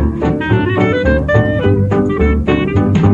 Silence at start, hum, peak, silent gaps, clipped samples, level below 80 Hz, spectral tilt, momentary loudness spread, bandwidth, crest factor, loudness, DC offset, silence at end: 0 s; none; 0 dBFS; none; under 0.1%; -22 dBFS; -8.5 dB/octave; 2 LU; 7.4 kHz; 12 dB; -13 LUFS; under 0.1%; 0 s